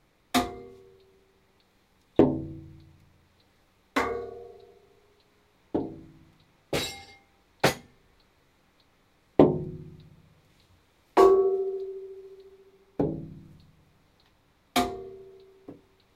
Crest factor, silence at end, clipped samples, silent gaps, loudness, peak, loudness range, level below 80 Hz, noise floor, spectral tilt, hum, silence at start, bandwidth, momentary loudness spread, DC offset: 28 dB; 0.4 s; under 0.1%; none; -27 LUFS; -2 dBFS; 11 LU; -56 dBFS; -65 dBFS; -5.5 dB/octave; none; 0.35 s; 16 kHz; 27 LU; under 0.1%